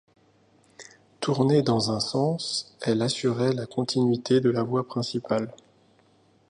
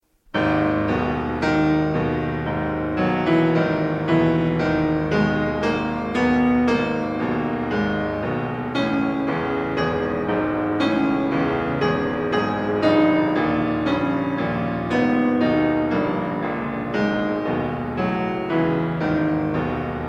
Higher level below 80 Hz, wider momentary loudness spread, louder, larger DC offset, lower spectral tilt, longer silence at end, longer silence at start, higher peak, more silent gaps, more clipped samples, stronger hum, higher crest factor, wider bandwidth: second, -64 dBFS vs -42 dBFS; about the same, 7 LU vs 6 LU; second, -25 LUFS vs -21 LUFS; neither; second, -6 dB/octave vs -8 dB/octave; first, 0.95 s vs 0 s; first, 0.8 s vs 0.35 s; about the same, -8 dBFS vs -6 dBFS; neither; neither; neither; about the same, 18 dB vs 16 dB; first, 11 kHz vs 7.8 kHz